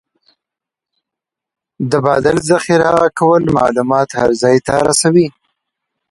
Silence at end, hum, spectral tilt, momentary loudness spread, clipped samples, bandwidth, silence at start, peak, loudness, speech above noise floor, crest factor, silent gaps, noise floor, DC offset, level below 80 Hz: 0.8 s; none; -5 dB/octave; 4 LU; under 0.1%; 11.5 kHz; 1.8 s; 0 dBFS; -13 LUFS; 73 dB; 14 dB; none; -85 dBFS; under 0.1%; -46 dBFS